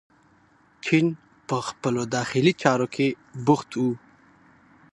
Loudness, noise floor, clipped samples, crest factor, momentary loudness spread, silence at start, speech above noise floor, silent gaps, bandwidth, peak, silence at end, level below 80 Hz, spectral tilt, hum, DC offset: -24 LUFS; -59 dBFS; under 0.1%; 24 dB; 9 LU; 0.85 s; 36 dB; none; 11.5 kHz; -2 dBFS; 0.95 s; -66 dBFS; -5.5 dB/octave; none; under 0.1%